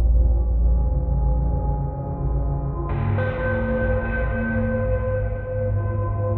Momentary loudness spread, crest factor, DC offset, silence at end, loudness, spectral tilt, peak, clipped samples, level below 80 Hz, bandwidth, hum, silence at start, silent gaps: 5 LU; 12 dB; under 0.1%; 0 s; -24 LUFS; -9 dB/octave; -8 dBFS; under 0.1%; -24 dBFS; 3.7 kHz; none; 0 s; none